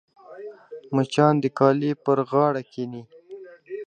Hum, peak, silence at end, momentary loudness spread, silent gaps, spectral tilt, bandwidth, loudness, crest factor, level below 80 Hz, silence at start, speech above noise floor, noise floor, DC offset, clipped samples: none; -4 dBFS; 0.05 s; 23 LU; none; -7.5 dB/octave; 9.6 kHz; -22 LUFS; 20 dB; -72 dBFS; 0.3 s; 22 dB; -43 dBFS; under 0.1%; under 0.1%